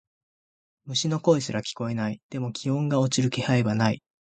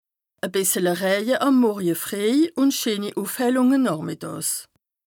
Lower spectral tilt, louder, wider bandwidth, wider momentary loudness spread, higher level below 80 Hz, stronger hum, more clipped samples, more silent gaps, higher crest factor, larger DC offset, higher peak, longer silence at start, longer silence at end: first, -5.5 dB/octave vs -4 dB/octave; second, -26 LUFS vs -22 LUFS; second, 9.4 kHz vs 20 kHz; about the same, 8 LU vs 9 LU; first, -62 dBFS vs -72 dBFS; neither; neither; first, 2.23-2.29 s vs none; first, 20 dB vs 14 dB; neither; about the same, -6 dBFS vs -8 dBFS; first, 0.85 s vs 0.45 s; about the same, 0.35 s vs 0.45 s